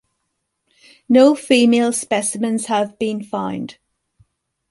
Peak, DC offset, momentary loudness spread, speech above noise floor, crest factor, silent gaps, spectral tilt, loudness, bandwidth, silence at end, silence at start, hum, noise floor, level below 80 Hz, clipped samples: -2 dBFS; under 0.1%; 12 LU; 57 dB; 18 dB; none; -4 dB/octave; -17 LUFS; 11.5 kHz; 1 s; 1.1 s; none; -74 dBFS; -64 dBFS; under 0.1%